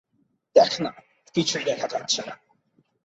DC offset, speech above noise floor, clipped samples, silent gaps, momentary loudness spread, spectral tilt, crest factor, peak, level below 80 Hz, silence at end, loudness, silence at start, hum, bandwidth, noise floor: under 0.1%; 43 dB; under 0.1%; none; 13 LU; -3 dB/octave; 22 dB; -4 dBFS; -68 dBFS; 0.7 s; -24 LUFS; 0.55 s; none; 8.2 kHz; -70 dBFS